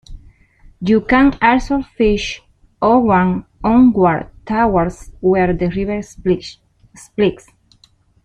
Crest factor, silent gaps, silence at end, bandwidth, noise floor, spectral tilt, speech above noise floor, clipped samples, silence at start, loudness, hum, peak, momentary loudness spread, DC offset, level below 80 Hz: 14 dB; none; 0.9 s; 10.5 kHz; -53 dBFS; -7 dB/octave; 39 dB; under 0.1%; 0.1 s; -16 LUFS; none; -2 dBFS; 11 LU; under 0.1%; -36 dBFS